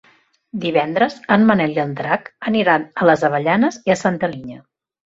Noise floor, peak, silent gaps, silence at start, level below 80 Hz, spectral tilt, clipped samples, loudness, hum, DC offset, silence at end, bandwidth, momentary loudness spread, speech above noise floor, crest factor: -51 dBFS; -2 dBFS; none; 0.55 s; -58 dBFS; -6 dB/octave; under 0.1%; -17 LUFS; none; under 0.1%; 0.45 s; 7.8 kHz; 9 LU; 33 dB; 16 dB